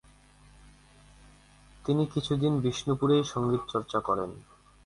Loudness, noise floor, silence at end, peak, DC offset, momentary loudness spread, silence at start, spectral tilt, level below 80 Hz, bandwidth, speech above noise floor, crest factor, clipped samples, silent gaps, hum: -29 LUFS; -57 dBFS; 0.45 s; -12 dBFS; under 0.1%; 8 LU; 1.85 s; -6.5 dB/octave; -56 dBFS; 11.5 kHz; 29 dB; 18 dB; under 0.1%; none; 50 Hz at -45 dBFS